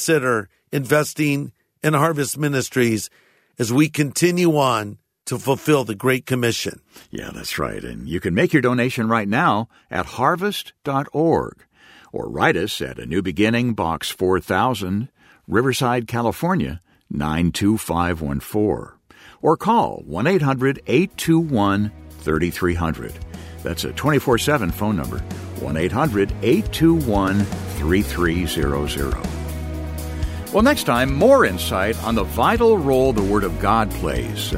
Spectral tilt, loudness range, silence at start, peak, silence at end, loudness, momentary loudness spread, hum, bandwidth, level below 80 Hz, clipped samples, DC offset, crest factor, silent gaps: -5.5 dB/octave; 4 LU; 0 s; -2 dBFS; 0 s; -20 LUFS; 12 LU; none; 16 kHz; -36 dBFS; under 0.1%; under 0.1%; 18 dB; none